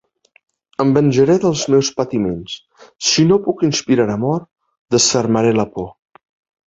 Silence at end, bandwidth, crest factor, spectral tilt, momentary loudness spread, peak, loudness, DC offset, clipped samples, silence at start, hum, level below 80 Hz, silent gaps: 0.75 s; 8.2 kHz; 16 dB; -4.5 dB/octave; 14 LU; -2 dBFS; -16 LUFS; under 0.1%; under 0.1%; 0.8 s; none; -50 dBFS; 4.79-4.85 s